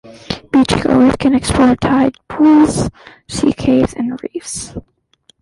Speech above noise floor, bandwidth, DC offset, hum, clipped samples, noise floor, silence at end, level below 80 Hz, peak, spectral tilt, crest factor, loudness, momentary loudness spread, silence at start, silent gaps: 41 dB; 11.5 kHz; under 0.1%; none; under 0.1%; -54 dBFS; 0.6 s; -34 dBFS; -2 dBFS; -5.5 dB/octave; 12 dB; -13 LUFS; 14 LU; 0.05 s; none